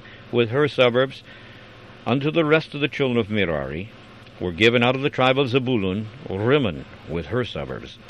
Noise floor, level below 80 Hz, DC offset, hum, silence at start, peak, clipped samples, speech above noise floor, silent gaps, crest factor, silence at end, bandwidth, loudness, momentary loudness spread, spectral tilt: -44 dBFS; -50 dBFS; under 0.1%; none; 0.05 s; -2 dBFS; under 0.1%; 22 dB; none; 20 dB; 0 s; 10 kHz; -22 LUFS; 15 LU; -7 dB/octave